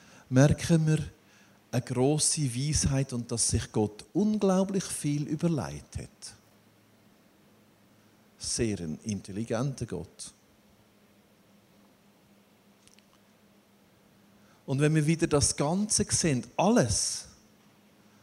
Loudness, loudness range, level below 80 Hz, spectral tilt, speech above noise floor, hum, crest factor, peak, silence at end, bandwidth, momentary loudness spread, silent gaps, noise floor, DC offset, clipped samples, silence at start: -28 LUFS; 12 LU; -52 dBFS; -5 dB/octave; 34 dB; none; 24 dB; -8 dBFS; 0.95 s; 15 kHz; 17 LU; none; -62 dBFS; under 0.1%; under 0.1%; 0.3 s